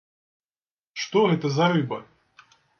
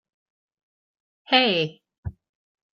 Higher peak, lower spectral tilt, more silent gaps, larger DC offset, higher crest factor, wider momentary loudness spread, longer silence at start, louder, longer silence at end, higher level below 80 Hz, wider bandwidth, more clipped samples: second, -8 dBFS vs -4 dBFS; about the same, -6 dB/octave vs -6 dB/octave; second, none vs 1.98-2.03 s; neither; second, 18 dB vs 24 dB; second, 14 LU vs 21 LU; second, 0.95 s vs 1.3 s; about the same, -23 LUFS vs -21 LUFS; first, 0.75 s vs 0.6 s; second, -70 dBFS vs -54 dBFS; about the same, 6.8 kHz vs 6.8 kHz; neither